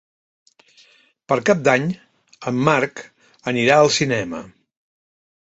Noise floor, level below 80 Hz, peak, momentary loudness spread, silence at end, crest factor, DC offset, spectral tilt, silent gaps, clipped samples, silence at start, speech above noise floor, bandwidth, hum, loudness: -54 dBFS; -58 dBFS; -2 dBFS; 17 LU; 1.1 s; 20 dB; under 0.1%; -4.5 dB/octave; none; under 0.1%; 1.3 s; 36 dB; 8.2 kHz; none; -18 LUFS